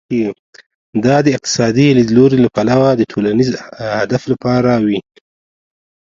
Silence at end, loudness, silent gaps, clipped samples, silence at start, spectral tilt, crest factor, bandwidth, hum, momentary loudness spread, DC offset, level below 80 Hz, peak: 1.05 s; -13 LUFS; 0.39-0.53 s, 0.66-0.93 s; under 0.1%; 0.1 s; -6 dB/octave; 14 dB; 7.6 kHz; none; 10 LU; under 0.1%; -48 dBFS; 0 dBFS